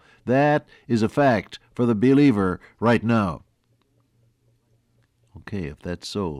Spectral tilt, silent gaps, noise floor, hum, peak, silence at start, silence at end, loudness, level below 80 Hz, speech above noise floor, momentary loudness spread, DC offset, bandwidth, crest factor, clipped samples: -7.5 dB/octave; none; -66 dBFS; none; -8 dBFS; 0.25 s; 0 s; -22 LUFS; -54 dBFS; 45 dB; 15 LU; under 0.1%; 11.5 kHz; 14 dB; under 0.1%